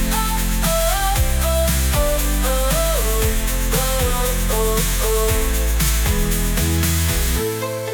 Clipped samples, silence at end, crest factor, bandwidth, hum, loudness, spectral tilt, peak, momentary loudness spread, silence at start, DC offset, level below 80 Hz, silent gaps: under 0.1%; 0 s; 14 dB; 19.5 kHz; none; -19 LUFS; -4 dB/octave; -4 dBFS; 2 LU; 0 s; under 0.1%; -20 dBFS; none